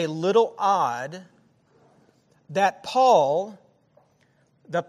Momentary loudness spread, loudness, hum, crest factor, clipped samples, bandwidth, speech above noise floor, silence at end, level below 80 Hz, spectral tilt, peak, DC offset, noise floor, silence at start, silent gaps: 17 LU; -22 LUFS; none; 18 dB; under 0.1%; 13.5 kHz; 42 dB; 0.05 s; -78 dBFS; -5 dB/octave; -6 dBFS; under 0.1%; -63 dBFS; 0 s; none